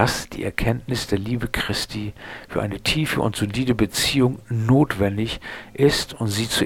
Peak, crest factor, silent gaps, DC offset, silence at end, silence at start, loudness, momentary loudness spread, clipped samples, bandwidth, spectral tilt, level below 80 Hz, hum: 0 dBFS; 22 dB; none; 0.2%; 0 s; 0 s; -22 LUFS; 10 LU; under 0.1%; 17.5 kHz; -5 dB/octave; -40 dBFS; none